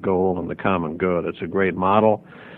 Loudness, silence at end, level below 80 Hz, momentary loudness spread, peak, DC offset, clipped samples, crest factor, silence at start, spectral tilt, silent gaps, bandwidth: -21 LUFS; 0 s; -54 dBFS; 7 LU; -2 dBFS; under 0.1%; under 0.1%; 18 dB; 0 s; -10.5 dB/octave; none; 4.1 kHz